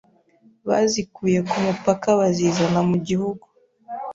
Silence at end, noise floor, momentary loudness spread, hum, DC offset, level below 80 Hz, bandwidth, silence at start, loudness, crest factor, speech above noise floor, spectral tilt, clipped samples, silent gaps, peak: 0 s; -56 dBFS; 14 LU; none; under 0.1%; -56 dBFS; 7.8 kHz; 0.65 s; -21 LUFS; 18 dB; 36 dB; -5.5 dB/octave; under 0.1%; none; -4 dBFS